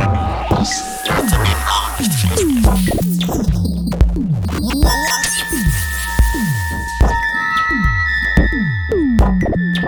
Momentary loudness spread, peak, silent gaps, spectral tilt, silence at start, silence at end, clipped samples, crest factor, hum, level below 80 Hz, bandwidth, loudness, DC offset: 4 LU; 0 dBFS; none; -4.5 dB/octave; 0 s; 0 s; under 0.1%; 14 dB; none; -20 dBFS; over 20 kHz; -16 LUFS; under 0.1%